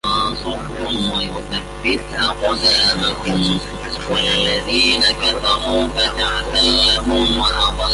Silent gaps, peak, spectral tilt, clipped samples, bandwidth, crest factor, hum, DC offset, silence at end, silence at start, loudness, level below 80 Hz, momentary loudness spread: none; -2 dBFS; -3.5 dB/octave; under 0.1%; 11.5 kHz; 16 dB; 50 Hz at -30 dBFS; under 0.1%; 0 s; 0.05 s; -16 LUFS; -30 dBFS; 10 LU